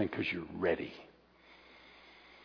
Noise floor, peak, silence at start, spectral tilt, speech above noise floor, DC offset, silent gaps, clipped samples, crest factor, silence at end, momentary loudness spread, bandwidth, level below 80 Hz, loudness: -62 dBFS; -18 dBFS; 0 s; -4 dB/octave; 25 dB; under 0.1%; none; under 0.1%; 20 dB; 0 s; 23 LU; 5.4 kHz; -68 dBFS; -36 LUFS